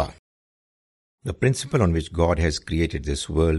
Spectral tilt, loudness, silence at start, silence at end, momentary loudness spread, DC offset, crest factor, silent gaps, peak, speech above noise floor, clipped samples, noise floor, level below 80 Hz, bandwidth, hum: -6 dB/octave; -23 LUFS; 0 s; 0 s; 9 LU; under 0.1%; 20 dB; 0.19-1.18 s; -4 dBFS; over 68 dB; under 0.1%; under -90 dBFS; -36 dBFS; 11.5 kHz; none